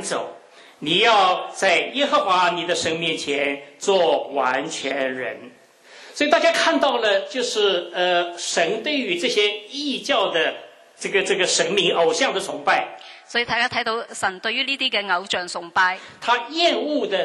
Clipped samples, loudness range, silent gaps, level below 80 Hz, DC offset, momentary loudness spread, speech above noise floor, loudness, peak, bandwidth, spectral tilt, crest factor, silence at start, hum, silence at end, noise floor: under 0.1%; 3 LU; none; -68 dBFS; under 0.1%; 8 LU; 25 dB; -20 LUFS; -2 dBFS; 12.5 kHz; -2 dB/octave; 20 dB; 0 s; none; 0 s; -46 dBFS